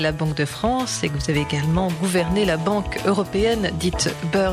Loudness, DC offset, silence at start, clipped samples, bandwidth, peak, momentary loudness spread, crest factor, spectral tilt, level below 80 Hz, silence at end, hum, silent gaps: -21 LUFS; under 0.1%; 0 s; under 0.1%; 16 kHz; -8 dBFS; 3 LU; 12 dB; -5 dB/octave; -36 dBFS; 0 s; none; none